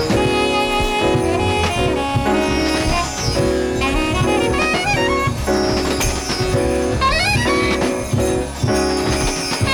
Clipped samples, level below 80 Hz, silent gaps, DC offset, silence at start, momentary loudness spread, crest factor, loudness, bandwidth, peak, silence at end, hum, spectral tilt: under 0.1%; -28 dBFS; none; under 0.1%; 0 s; 3 LU; 14 dB; -17 LUFS; over 20 kHz; -4 dBFS; 0 s; none; -4.5 dB/octave